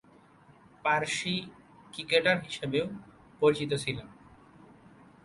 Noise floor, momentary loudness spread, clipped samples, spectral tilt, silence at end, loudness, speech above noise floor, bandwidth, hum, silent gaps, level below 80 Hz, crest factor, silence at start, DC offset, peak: -58 dBFS; 16 LU; under 0.1%; -4 dB/octave; 1.1 s; -30 LUFS; 29 dB; 11.5 kHz; none; none; -64 dBFS; 22 dB; 0.85 s; under 0.1%; -10 dBFS